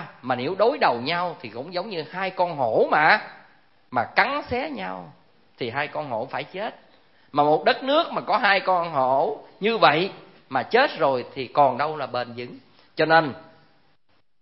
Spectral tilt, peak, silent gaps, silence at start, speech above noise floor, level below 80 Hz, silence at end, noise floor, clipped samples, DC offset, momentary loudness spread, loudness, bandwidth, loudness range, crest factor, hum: -9 dB/octave; 0 dBFS; none; 0 s; 45 dB; -64 dBFS; 1 s; -68 dBFS; under 0.1%; 0.1%; 14 LU; -23 LUFS; 5.8 kHz; 6 LU; 24 dB; none